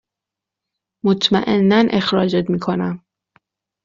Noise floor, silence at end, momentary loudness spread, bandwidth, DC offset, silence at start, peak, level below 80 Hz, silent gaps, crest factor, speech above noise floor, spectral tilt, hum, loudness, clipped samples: -85 dBFS; 0.9 s; 9 LU; 7.6 kHz; under 0.1%; 1.05 s; -2 dBFS; -54 dBFS; none; 16 dB; 69 dB; -4.5 dB/octave; none; -17 LUFS; under 0.1%